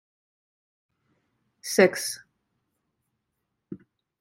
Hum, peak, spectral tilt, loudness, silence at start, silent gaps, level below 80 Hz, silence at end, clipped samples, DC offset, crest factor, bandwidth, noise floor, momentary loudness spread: none; -4 dBFS; -3.5 dB/octave; -23 LUFS; 1.65 s; none; -80 dBFS; 0.45 s; under 0.1%; under 0.1%; 28 dB; 16 kHz; -80 dBFS; 24 LU